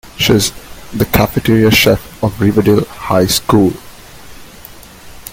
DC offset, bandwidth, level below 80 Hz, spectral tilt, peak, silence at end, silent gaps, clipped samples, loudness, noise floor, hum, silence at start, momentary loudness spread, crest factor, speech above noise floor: under 0.1%; 17 kHz; -34 dBFS; -5 dB/octave; 0 dBFS; 0 s; none; under 0.1%; -12 LUFS; -35 dBFS; none; 0.05 s; 10 LU; 14 dB; 24 dB